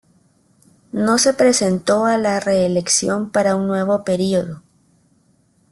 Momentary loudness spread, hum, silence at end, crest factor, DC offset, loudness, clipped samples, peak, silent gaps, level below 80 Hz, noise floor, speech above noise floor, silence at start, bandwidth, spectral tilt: 7 LU; none; 1.1 s; 16 dB; under 0.1%; -17 LUFS; under 0.1%; -2 dBFS; none; -56 dBFS; -59 dBFS; 42 dB; 0.95 s; 12.5 kHz; -4 dB/octave